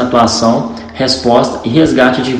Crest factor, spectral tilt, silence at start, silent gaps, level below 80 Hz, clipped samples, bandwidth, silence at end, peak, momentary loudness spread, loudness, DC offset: 10 dB; -4.5 dB/octave; 0 s; none; -38 dBFS; 1%; 10 kHz; 0 s; 0 dBFS; 7 LU; -11 LUFS; under 0.1%